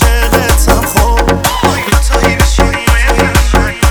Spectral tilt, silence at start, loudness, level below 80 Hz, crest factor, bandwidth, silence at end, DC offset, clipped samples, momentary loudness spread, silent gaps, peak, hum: -4.5 dB/octave; 0 s; -10 LUFS; -12 dBFS; 8 dB; over 20 kHz; 0 s; under 0.1%; 2%; 2 LU; none; 0 dBFS; none